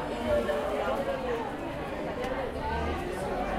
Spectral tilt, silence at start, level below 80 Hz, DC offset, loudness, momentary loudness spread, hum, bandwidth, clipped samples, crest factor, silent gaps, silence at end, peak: -6 dB/octave; 0 s; -44 dBFS; under 0.1%; -32 LUFS; 6 LU; none; 16 kHz; under 0.1%; 16 dB; none; 0 s; -16 dBFS